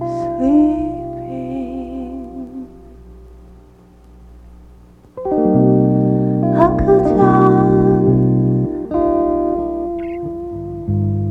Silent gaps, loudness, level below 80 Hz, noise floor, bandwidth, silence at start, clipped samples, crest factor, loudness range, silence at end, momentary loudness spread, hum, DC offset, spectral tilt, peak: none; -16 LUFS; -36 dBFS; -44 dBFS; 5.4 kHz; 0 s; under 0.1%; 16 dB; 18 LU; 0 s; 15 LU; none; under 0.1%; -11 dB/octave; 0 dBFS